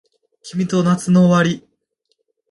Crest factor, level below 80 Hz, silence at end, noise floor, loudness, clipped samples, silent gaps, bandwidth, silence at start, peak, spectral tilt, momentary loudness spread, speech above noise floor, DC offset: 16 dB; -58 dBFS; 0.95 s; -69 dBFS; -16 LUFS; under 0.1%; none; 11.5 kHz; 0.45 s; -2 dBFS; -6.5 dB/octave; 14 LU; 55 dB; under 0.1%